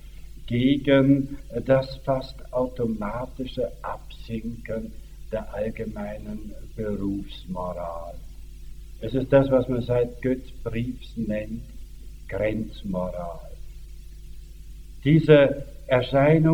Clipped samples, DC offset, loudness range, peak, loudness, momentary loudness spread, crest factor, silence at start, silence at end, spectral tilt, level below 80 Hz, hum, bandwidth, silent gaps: under 0.1%; under 0.1%; 9 LU; -4 dBFS; -25 LUFS; 26 LU; 22 dB; 0.05 s; 0 s; -8 dB/octave; -40 dBFS; none; 17 kHz; none